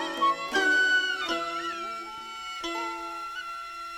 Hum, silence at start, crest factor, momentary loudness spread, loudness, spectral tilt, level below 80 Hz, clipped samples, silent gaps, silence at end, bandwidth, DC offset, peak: none; 0 s; 16 dB; 15 LU; -28 LUFS; -1 dB/octave; -64 dBFS; under 0.1%; none; 0 s; 16.5 kHz; under 0.1%; -14 dBFS